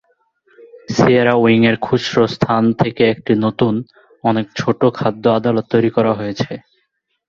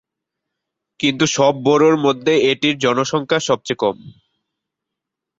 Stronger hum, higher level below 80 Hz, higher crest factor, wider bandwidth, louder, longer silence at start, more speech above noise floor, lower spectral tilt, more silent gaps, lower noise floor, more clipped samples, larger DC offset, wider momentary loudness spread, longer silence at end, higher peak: neither; first, -50 dBFS vs -60 dBFS; about the same, 14 dB vs 16 dB; second, 7.2 kHz vs 8 kHz; about the same, -16 LUFS vs -16 LUFS; second, 0.6 s vs 1 s; second, 53 dB vs 66 dB; first, -7 dB/octave vs -4 dB/octave; neither; second, -68 dBFS vs -82 dBFS; neither; neither; about the same, 9 LU vs 7 LU; second, 0.7 s vs 1.3 s; about the same, -2 dBFS vs -2 dBFS